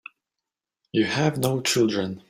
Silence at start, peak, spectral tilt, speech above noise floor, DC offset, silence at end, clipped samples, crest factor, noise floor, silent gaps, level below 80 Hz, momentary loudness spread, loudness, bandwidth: 0.95 s; -6 dBFS; -4.5 dB/octave; 64 dB; under 0.1%; 0.1 s; under 0.1%; 20 dB; -87 dBFS; none; -60 dBFS; 4 LU; -23 LUFS; 16 kHz